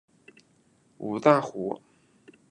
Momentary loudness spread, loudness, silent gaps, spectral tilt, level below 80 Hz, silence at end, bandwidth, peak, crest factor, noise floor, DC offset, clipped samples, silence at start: 17 LU; -25 LUFS; none; -7 dB/octave; -76 dBFS; 0.75 s; 9.8 kHz; -6 dBFS; 24 dB; -64 dBFS; under 0.1%; under 0.1%; 1 s